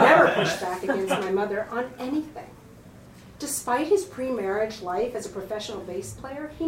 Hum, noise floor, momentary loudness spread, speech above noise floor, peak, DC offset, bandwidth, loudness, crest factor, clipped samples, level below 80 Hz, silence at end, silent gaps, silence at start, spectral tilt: none; -47 dBFS; 13 LU; 19 dB; -2 dBFS; under 0.1%; 16.5 kHz; -26 LUFS; 22 dB; under 0.1%; -56 dBFS; 0 s; none; 0 s; -4 dB/octave